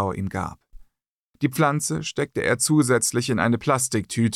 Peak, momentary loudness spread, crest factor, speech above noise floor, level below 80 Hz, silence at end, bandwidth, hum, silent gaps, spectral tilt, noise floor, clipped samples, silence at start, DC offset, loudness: -8 dBFS; 9 LU; 16 dB; 49 dB; -52 dBFS; 0 s; 16 kHz; none; 1.08-1.34 s; -4.5 dB/octave; -72 dBFS; under 0.1%; 0 s; under 0.1%; -22 LUFS